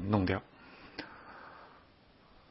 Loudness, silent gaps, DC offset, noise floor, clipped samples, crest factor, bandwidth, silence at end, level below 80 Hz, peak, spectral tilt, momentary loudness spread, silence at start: -37 LUFS; none; under 0.1%; -62 dBFS; under 0.1%; 24 dB; 5.6 kHz; 0.8 s; -62 dBFS; -14 dBFS; -6 dB/octave; 24 LU; 0 s